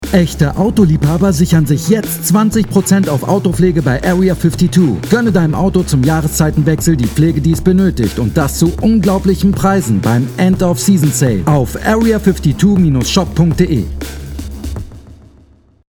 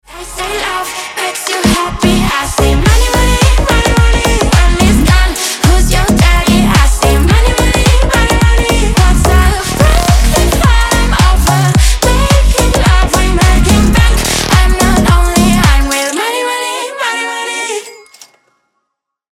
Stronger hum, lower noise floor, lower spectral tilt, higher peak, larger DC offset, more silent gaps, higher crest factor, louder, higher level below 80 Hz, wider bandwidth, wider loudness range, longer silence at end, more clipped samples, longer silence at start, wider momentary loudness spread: neither; second, -46 dBFS vs -72 dBFS; first, -6.5 dB/octave vs -4.5 dB/octave; about the same, 0 dBFS vs 0 dBFS; neither; neither; about the same, 12 dB vs 8 dB; about the same, -12 LUFS vs -10 LUFS; second, -26 dBFS vs -12 dBFS; first, 19.5 kHz vs 16.5 kHz; about the same, 1 LU vs 3 LU; second, 0.75 s vs 1.4 s; first, 0.1% vs under 0.1%; about the same, 0 s vs 0.1 s; second, 3 LU vs 7 LU